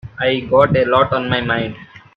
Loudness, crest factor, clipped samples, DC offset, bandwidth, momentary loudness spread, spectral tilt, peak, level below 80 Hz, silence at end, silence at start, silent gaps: -16 LUFS; 16 dB; under 0.1%; under 0.1%; 5.4 kHz; 7 LU; -8 dB/octave; 0 dBFS; -46 dBFS; 0.2 s; 0.05 s; none